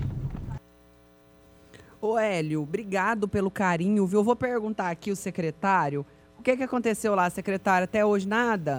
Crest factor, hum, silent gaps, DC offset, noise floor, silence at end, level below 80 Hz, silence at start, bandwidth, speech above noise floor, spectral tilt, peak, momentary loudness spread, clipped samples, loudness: 18 dB; none; none; under 0.1%; -56 dBFS; 0 s; -52 dBFS; 0 s; 19.5 kHz; 31 dB; -6 dB/octave; -10 dBFS; 9 LU; under 0.1%; -26 LUFS